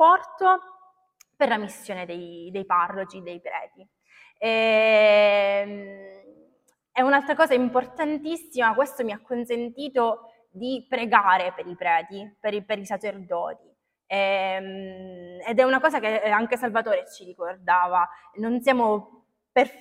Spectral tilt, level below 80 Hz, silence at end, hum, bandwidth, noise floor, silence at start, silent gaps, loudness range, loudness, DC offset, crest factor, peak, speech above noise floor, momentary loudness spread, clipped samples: -4.5 dB/octave; -72 dBFS; 0.1 s; none; 15.5 kHz; -66 dBFS; 0 s; none; 7 LU; -23 LUFS; under 0.1%; 22 dB; -2 dBFS; 42 dB; 16 LU; under 0.1%